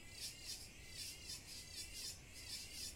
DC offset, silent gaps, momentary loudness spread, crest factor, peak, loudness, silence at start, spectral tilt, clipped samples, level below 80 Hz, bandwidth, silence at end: under 0.1%; none; 3 LU; 18 dB; -34 dBFS; -49 LUFS; 0 s; -1 dB/octave; under 0.1%; -64 dBFS; 16.5 kHz; 0 s